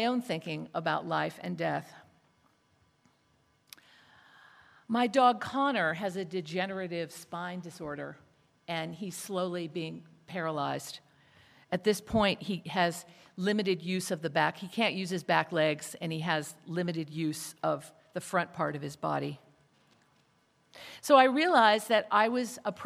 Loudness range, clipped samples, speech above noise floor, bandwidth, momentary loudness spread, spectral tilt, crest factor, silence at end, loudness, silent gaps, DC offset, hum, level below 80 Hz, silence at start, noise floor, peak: 10 LU; under 0.1%; 39 dB; 16 kHz; 16 LU; -4.5 dB/octave; 24 dB; 0 s; -31 LUFS; none; under 0.1%; none; -68 dBFS; 0 s; -70 dBFS; -8 dBFS